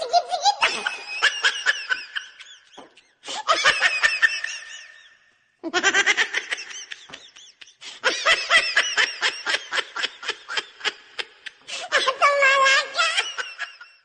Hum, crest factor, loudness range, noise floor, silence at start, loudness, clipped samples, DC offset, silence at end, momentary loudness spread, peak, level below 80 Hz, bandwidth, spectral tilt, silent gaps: none; 18 dB; 4 LU; -61 dBFS; 0 s; -21 LUFS; under 0.1%; under 0.1%; 0.2 s; 18 LU; -6 dBFS; -66 dBFS; 10 kHz; 1 dB/octave; none